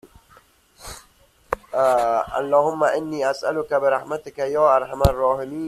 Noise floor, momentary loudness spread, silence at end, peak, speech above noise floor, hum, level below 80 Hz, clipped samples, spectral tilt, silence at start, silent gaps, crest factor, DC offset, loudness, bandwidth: -56 dBFS; 17 LU; 0 s; -2 dBFS; 35 dB; none; -40 dBFS; under 0.1%; -6 dB/octave; 0.05 s; none; 20 dB; under 0.1%; -21 LUFS; 15 kHz